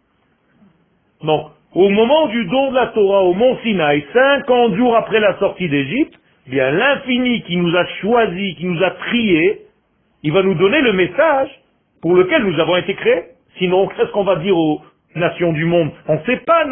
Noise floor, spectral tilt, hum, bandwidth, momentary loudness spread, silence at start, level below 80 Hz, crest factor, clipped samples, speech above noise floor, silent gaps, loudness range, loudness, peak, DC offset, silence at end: -61 dBFS; -11.5 dB/octave; none; 3.6 kHz; 7 LU; 1.25 s; -50 dBFS; 14 dB; under 0.1%; 46 dB; none; 3 LU; -16 LUFS; 0 dBFS; under 0.1%; 0 s